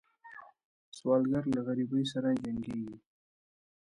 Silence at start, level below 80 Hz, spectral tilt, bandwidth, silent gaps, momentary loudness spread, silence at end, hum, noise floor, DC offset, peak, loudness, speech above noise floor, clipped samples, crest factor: 0.25 s; -66 dBFS; -7 dB/octave; 11 kHz; 0.65-0.92 s; 22 LU; 1 s; none; -53 dBFS; under 0.1%; -16 dBFS; -32 LUFS; 22 dB; under 0.1%; 18 dB